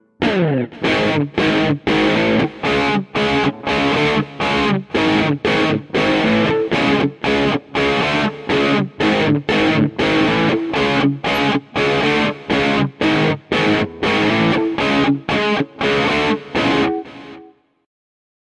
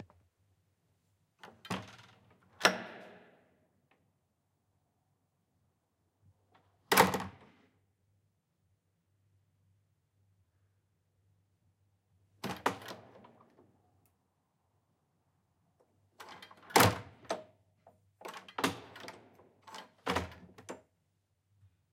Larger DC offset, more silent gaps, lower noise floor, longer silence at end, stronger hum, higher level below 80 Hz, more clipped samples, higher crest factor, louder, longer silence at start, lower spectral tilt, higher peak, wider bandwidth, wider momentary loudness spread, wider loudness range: neither; neither; second, -45 dBFS vs -80 dBFS; about the same, 1.05 s vs 1.15 s; neither; first, -44 dBFS vs -70 dBFS; neither; second, 14 dB vs 34 dB; first, -17 LUFS vs -32 LUFS; first, 0.2 s vs 0 s; first, -6 dB/octave vs -3.5 dB/octave; first, -2 dBFS vs -6 dBFS; second, 12 kHz vs 16 kHz; second, 3 LU vs 26 LU; second, 1 LU vs 10 LU